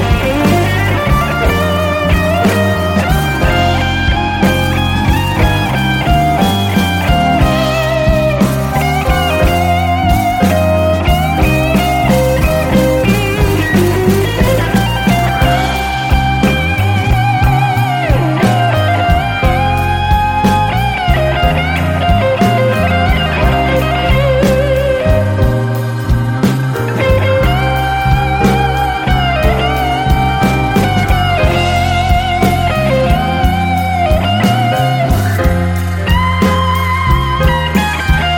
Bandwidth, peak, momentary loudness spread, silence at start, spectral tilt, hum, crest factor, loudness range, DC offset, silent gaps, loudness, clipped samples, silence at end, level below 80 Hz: 17 kHz; 0 dBFS; 2 LU; 0 s; -6 dB/octave; none; 10 dB; 1 LU; under 0.1%; none; -12 LUFS; under 0.1%; 0 s; -20 dBFS